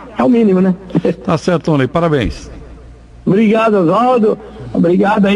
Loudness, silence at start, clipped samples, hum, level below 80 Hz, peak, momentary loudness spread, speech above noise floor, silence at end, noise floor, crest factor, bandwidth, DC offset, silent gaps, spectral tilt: -13 LUFS; 0 s; under 0.1%; none; -36 dBFS; -2 dBFS; 11 LU; 24 dB; 0 s; -36 dBFS; 12 dB; 10 kHz; under 0.1%; none; -8 dB/octave